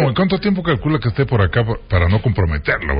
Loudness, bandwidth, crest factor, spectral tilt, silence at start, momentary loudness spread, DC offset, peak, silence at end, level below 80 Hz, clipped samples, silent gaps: -17 LUFS; 5.2 kHz; 14 dB; -12.5 dB/octave; 0 s; 3 LU; under 0.1%; -4 dBFS; 0 s; -26 dBFS; under 0.1%; none